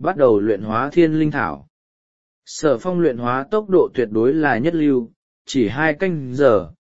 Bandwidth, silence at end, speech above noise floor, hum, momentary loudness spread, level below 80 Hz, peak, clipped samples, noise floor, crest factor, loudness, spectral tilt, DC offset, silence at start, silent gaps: 8 kHz; 0.1 s; over 72 dB; none; 7 LU; -52 dBFS; 0 dBFS; under 0.1%; under -90 dBFS; 18 dB; -18 LUFS; -6.5 dB/octave; 1%; 0 s; 1.70-2.42 s, 5.16-5.45 s